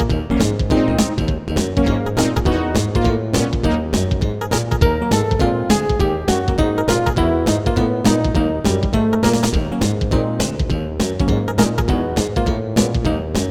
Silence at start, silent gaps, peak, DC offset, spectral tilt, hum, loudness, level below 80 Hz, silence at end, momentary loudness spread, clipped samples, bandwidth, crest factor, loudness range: 0 s; none; 0 dBFS; under 0.1%; -6 dB/octave; none; -18 LUFS; -24 dBFS; 0 s; 4 LU; under 0.1%; 17.5 kHz; 16 dB; 2 LU